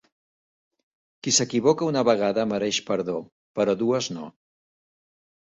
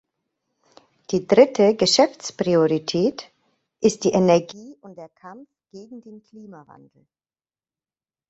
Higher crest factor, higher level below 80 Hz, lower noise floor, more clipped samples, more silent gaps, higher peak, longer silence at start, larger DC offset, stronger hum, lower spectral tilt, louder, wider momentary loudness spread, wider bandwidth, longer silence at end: about the same, 20 dB vs 20 dB; about the same, -66 dBFS vs -64 dBFS; about the same, under -90 dBFS vs under -90 dBFS; neither; first, 3.32-3.55 s vs none; second, -6 dBFS vs -2 dBFS; first, 1.25 s vs 1.1 s; neither; neither; second, -3.5 dB/octave vs -5 dB/octave; second, -23 LUFS vs -19 LUFS; second, 13 LU vs 25 LU; about the same, 8.4 kHz vs 8.2 kHz; second, 1.2 s vs 1.75 s